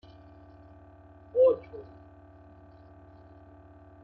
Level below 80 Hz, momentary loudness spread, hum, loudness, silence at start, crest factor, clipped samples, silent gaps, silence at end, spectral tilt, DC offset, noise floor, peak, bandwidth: -62 dBFS; 29 LU; none; -26 LUFS; 1.35 s; 20 dB; under 0.1%; none; 2.25 s; -7.5 dB/octave; under 0.1%; -53 dBFS; -14 dBFS; 4.3 kHz